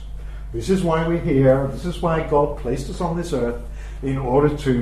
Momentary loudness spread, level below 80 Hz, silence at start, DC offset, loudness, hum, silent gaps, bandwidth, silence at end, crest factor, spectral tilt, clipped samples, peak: 14 LU; -32 dBFS; 0 s; under 0.1%; -21 LUFS; none; none; 13.5 kHz; 0 s; 18 dB; -7.5 dB/octave; under 0.1%; -4 dBFS